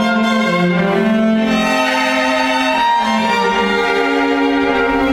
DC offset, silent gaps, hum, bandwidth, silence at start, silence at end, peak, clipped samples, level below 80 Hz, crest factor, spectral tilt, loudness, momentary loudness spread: under 0.1%; none; none; 15.5 kHz; 0 s; 0 s; -2 dBFS; under 0.1%; -42 dBFS; 12 dB; -5 dB/octave; -14 LUFS; 1 LU